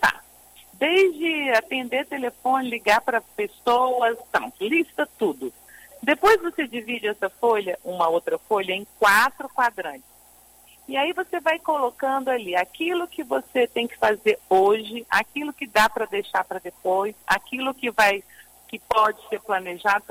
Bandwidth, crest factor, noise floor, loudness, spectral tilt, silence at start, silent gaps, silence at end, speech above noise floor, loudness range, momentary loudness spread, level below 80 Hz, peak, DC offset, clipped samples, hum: 16 kHz; 16 dB; -53 dBFS; -23 LUFS; -3 dB/octave; 0 s; none; 0.1 s; 30 dB; 2 LU; 9 LU; -60 dBFS; -6 dBFS; under 0.1%; under 0.1%; none